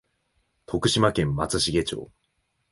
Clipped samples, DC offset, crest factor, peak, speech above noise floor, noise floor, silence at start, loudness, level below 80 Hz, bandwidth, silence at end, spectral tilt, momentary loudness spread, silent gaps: under 0.1%; under 0.1%; 20 dB; -6 dBFS; 49 dB; -73 dBFS; 0.7 s; -24 LUFS; -46 dBFS; 11.5 kHz; 0.65 s; -4.5 dB/octave; 11 LU; none